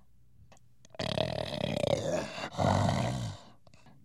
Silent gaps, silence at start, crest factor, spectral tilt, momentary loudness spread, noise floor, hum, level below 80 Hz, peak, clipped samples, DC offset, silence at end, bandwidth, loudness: none; 1 s; 20 dB; -5.5 dB/octave; 11 LU; -62 dBFS; none; -54 dBFS; -12 dBFS; under 0.1%; 0.1%; 0.15 s; 13.5 kHz; -32 LUFS